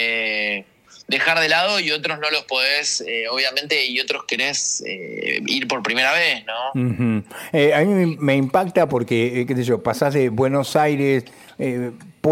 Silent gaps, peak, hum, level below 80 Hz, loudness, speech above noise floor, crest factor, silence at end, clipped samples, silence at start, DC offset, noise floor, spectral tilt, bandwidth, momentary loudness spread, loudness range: none; -4 dBFS; none; -62 dBFS; -19 LUFS; 23 dB; 16 dB; 0 s; under 0.1%; 0 s; under 0.1%; -43 dBFS; -4 dB/octave; 16.5 kHz; 8 LU; 2 LU